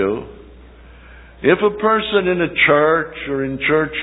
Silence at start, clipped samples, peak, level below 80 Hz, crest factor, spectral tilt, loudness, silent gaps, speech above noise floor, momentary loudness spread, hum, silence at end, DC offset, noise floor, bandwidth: 0 s; under 0.1%; 0 dBFS; -44 dBFS; 18 dB; -9 dB/octave; -16 LUFS; none; 25 dB; 10 LU; none; 0 s; under 0.1%; -41 dBFS; 4 kHz